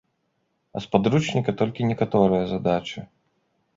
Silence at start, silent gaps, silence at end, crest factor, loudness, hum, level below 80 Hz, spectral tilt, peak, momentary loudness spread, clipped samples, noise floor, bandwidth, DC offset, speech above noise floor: 0.75 s; none; 0.7 s; 22 dB; -23 LUFS; none; -54 dBFS; -7 dB/octave; -2 dBFS; 15 LU; under 0.1%; -73 dBFS; 7.8 kHz; under 0.1%; 50 dB